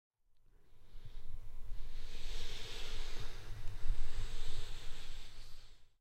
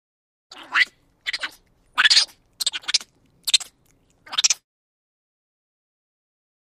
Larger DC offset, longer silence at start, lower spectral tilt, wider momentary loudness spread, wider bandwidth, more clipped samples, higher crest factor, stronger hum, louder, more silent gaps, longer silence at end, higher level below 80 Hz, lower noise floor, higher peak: neither; first, 0.7 s vs 0.5 s; first, -3.5 dB/octave vs 4 dB/octave; second, 12 LU vs 15 LU; second, 8.4 kHz vs 15.5 kHz; neither; second, 14 dB vs 26 dB; neither; second, -49 LUFS vs -20 LUFS; neither; second, 0.15 s vs 2.05 s; first, -40 dBFS vs -68 dBFS; about the same, -64 dBFS vs -61 dBFS; second, -20 dBFS vs 0 dBFS